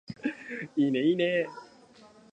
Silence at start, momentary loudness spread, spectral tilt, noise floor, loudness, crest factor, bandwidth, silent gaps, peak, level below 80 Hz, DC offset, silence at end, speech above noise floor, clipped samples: 0.1 s; 13 LU; -7 dB/octave; -55 dBFS; -29 LUFS; 16 dB; 8.8 kHz; none; -14 dBFS; -76 dBFS; under 0.1%; 0.7 s; 28 dB; under 0.1%